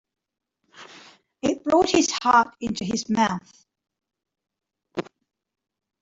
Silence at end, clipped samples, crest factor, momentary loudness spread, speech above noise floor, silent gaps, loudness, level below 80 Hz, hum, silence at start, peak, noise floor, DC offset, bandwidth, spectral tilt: 1 s; under 0.1%; 20 dB; 16 LU; 29 dB; none; -22 LUFS; -60 dBFS; none; 0.8 s; -6 dBFS; -51 dBFS; under 0.1%; 8 kHz; -3.5 dB/octave